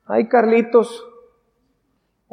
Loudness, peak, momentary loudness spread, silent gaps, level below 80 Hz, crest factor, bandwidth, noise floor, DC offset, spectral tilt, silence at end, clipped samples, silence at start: -16 LUFS; -2 dBFS; 14 LU; none; -72 dBFS; 18 dB; 10.5 kHz; -68 dBFS; under 0.1%; -6.5 dB/octave; 1.3 s; under 0.1%; 0.1 s